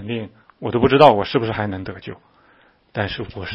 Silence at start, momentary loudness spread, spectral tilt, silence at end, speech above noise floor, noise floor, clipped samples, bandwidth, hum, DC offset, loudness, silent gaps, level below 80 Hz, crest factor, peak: 0 s; 21 LU; -8 dB/octave; 0 s; 36 dB; -55 dBFS; under 0.1%; 9.2 kHz; none; under 0.1%; -18 LUFS; none; -46 dBFS; 20 dB; 0 dBFS